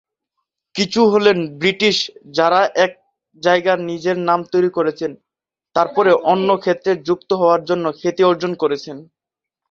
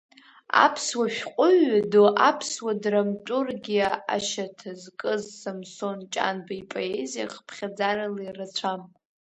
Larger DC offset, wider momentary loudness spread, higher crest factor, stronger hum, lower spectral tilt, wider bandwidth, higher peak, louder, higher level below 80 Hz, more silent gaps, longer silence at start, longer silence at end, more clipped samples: neither; second, 8 LU vs 16 LU; second, 16 dB vs 22 dB; neither; first, -5 dB/octave vs -3.5 dB/octave; second, 7.8 kHz vs 8.8 kHz; about the same, -2 dBFS vs -4 dBFS; first, -17 LUFS vs -25 LUFS; first, -62 dBFS vs -70 dBFS; neither; first, 0.75 s vs 0.55 s; first, 0.65 s vs 0.5 s; neither